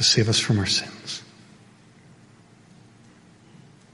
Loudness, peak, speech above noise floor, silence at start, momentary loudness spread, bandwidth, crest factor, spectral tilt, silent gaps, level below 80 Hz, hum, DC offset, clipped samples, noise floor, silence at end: -22 LUFS; -6 dBFS; 30 dB; 0 s; 16 LU; 11.5 kHz; 22 dB; -3.5 dB/octave; none; -58 dBFS; none; under 0.1%; under 0.1%; -52 dBFS; 2.7 s